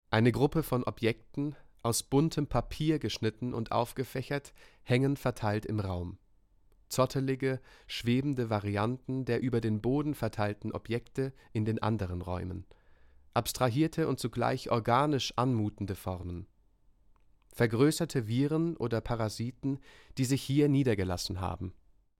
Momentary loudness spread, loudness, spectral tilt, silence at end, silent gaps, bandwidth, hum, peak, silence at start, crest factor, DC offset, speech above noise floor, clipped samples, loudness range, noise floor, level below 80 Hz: 10 LU; -32 LUFS; -6 dB/octave; 0.45 s; none; 16.5 kHz; none; -12 dBFS; 0.1 s; 20 dB; under 0.1%; 34 dB; under 0.1%; 3 LU; -64 dBFS; -54 dBFS